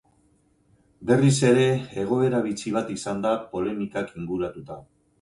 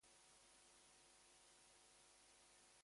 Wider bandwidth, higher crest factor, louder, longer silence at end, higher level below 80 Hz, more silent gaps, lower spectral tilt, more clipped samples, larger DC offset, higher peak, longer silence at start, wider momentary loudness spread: about the same, 11.5 kHz vs 11.5 kHz; about the same, 18 dB vs 14 dB; first, -24 LUFS vs -68 LUFS; first, 0.4 s vs 0 s; first, -58 dBFS vs -90 dBFS; neither; first, -6 dB/octave vs -0.5 dB/octave; neither; neither; first, -6 dBFS vs -58 dBFS; first, 1 s vs 0 s; first, 14 LU vs 0 LU